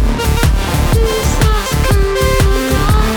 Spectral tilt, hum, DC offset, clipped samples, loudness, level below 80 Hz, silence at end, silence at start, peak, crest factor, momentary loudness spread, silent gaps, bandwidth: -5 dB/octave; none; under 0.1%; under 0.1%; -13 LUFS; -14 dBFS; 0 s; 0 s; 0 dBFS; 12 dB; 2 LU; none; over 20 kHz